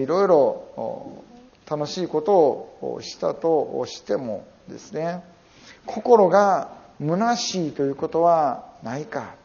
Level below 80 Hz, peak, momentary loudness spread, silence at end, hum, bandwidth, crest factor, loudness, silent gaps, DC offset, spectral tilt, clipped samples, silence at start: -64 dBFS; -2 dBFS; 17 LU; 0.1 s; none; 7.2 kHz; 22 dB; -22 LUFS; none; under 0.1%; -5 dB/octave; under 0.1%; 0 s